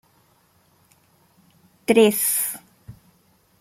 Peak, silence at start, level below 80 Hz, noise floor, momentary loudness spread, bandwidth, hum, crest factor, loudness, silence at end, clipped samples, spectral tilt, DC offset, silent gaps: -2 dBFS; 1.9 s; -64 dBFS; -61 dBFS; 16 LU; 16.5 kHz; none; 22 dB; -19 LUFS; 0.7 s; under 0.1%; -3 dB/octave; under 0.1%; none